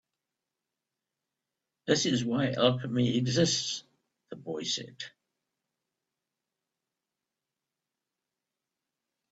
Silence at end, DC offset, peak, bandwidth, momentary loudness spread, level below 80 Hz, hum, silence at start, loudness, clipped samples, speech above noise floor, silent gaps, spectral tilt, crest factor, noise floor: 4.25 s; under 0.1%; -8 dBFS; 8 kHz; 17 LU; -70 dBFS; none; 1.85 s; -29 LUFS; under 0.1%; 60 dB; none; -4.5 dB/octave; 26 dB; -89 dBFS